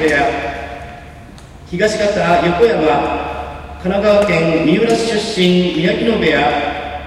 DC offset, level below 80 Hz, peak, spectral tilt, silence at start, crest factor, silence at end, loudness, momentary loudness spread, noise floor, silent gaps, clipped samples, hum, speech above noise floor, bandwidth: under 0.1%; -36 dBFS; 0 dBFS; -5.5 dB/octave; 0 s; 14 dB; 0 s; -14 LUFS; 14 LU; -36 dBFS; none; under 0.1%; none; 22 dB; 13 kHz